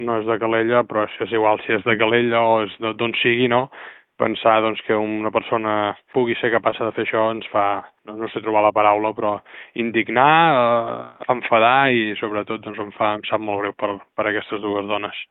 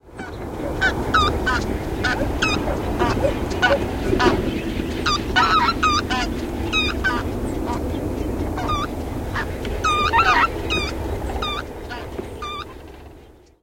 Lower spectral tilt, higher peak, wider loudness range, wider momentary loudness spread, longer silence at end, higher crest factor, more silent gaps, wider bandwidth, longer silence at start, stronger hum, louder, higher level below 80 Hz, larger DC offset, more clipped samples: first, -9.5 dB/octave vs -4.5 dB/octave; about the same, 0 dBFS vs -2 dBFS; about the same, 4 LU vs 4 LU; second, 11 LU vs 14 LU; second, 0.05 s vs 0.3 s; about the same, 18 dB vs 20 dB; neither; second, 4.1 kHz vs 16.5 kHz; about the same, 0 s vs 0.05 s; neither; about the same, -19 LUFS vs -21 LUFS; second, -62 dBFS vs -32 dBFS; neither; neither